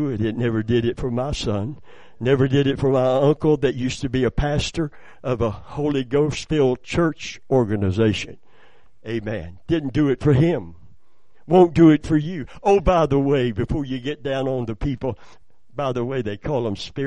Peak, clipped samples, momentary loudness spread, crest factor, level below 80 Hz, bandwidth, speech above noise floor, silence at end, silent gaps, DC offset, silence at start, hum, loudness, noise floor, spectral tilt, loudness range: -2 dBFS; under 0.1%; 11 LU; 20 dB; -38 dBFS; 10 kHz; 43 dB; 0 s; none; 0.9%; 0 s; none; -21 LUFS; -63 dBFS; -7 dB/octave; 5 LU